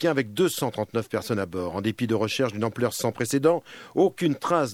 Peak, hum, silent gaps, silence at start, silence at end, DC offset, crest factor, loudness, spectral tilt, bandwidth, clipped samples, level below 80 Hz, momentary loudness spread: -8 dBFS; none; none; 0 s; 0 s; under 0.1%; 16 dB; -26 LUFS; -5 dB/octave; 17.5 kHz; under 0.1%; -64 dBFS; 6 LU